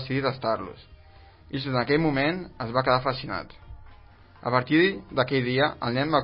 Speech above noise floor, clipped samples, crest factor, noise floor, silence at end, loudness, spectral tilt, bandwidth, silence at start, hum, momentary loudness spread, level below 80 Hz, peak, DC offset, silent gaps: 26 dB; under 0.1%; 20 dB; -51 dBFS; 0 s; -25 LUFS; -10.5 dB/octave; 5.8 kHz; 0 s; none; 12 LU; -52 dBFS; -6 dBFS; under 0.1%; none